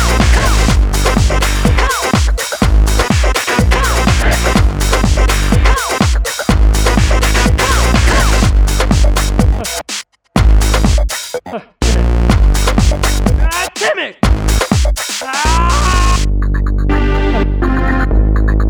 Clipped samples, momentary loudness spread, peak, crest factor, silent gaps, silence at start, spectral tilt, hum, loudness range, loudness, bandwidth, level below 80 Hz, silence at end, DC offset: under 0.1%; 5 LU; 0 dBFS; 10 dB; none; 0 s; -4.5 dB/octave; none; 2 LU; -13 LUFS; over 20 kHz; -12 dBFS; 0 s; under 0.1%